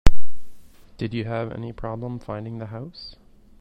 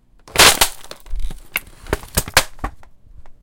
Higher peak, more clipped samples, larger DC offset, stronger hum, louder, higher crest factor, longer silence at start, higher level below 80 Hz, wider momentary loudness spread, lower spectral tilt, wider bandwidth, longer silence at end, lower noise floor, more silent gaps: about the same, 0 dBFS vs 0 dBFS; first, 0.3% vs under 0.1%; neither; neither; second, -31 LUFS vs -15 LUFS; about the same, 18 dB vs 20 dB; second, 0.05 s vs 0.35 s; about the same, -30 dBFS vs -30 dBFS; second, 13 LU vs 23 LU; first, -6.5 dB/octave vs -1 dB/octave; second, 8.2 kHz vs over 20 kHz; about the same, 0 s vs 0.1 s; about the same, -40 dBFS vs -39 dBFS; neither